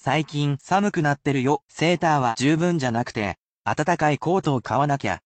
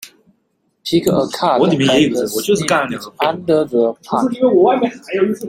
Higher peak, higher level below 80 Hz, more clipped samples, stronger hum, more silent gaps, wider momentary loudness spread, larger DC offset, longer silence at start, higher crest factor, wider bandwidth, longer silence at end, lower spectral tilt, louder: second, -8 dBFS vs 0 dBFS; about the same, -56 dBFS vs -54 dBFS; neither; neither; first, 1.63-1.68 s, 3.38-3.62 s vs none; about the same, 5 LU vs 6 LU; neither; about the same, 0.05 s vs 0 s; about the same, 14 dB vs 16 dB; second, 9 kHz vs 16.5 kHz; about the same, 0.05 s vs 0 s; about the same, -6 dB/octave vs -5 dB/octave; second, -23 LUFS vs -15 LUFS